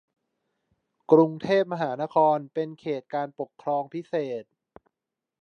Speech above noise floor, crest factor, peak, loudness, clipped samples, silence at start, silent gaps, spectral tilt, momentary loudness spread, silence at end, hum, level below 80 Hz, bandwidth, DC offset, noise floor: 62 dB; 22 dB; -4 dBFS; -26 LUFS; under 0.1%; 1.1 s; none; -8 dB/octave; 14 LU; 1 s; none; -74 dBFS; 6.8 kHz; under 0.1%; -87 dBFS